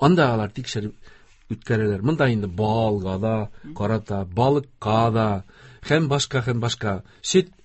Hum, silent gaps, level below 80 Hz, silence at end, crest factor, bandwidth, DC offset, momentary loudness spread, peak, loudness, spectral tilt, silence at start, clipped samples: none; none; -46 dBFS; 0.2 s; 18 dB; 8.4 kHz; under 0.1%; 9 LU; -4 dBFS; -23 LUFS; -6 dB/octave; 0 s; under 0.1%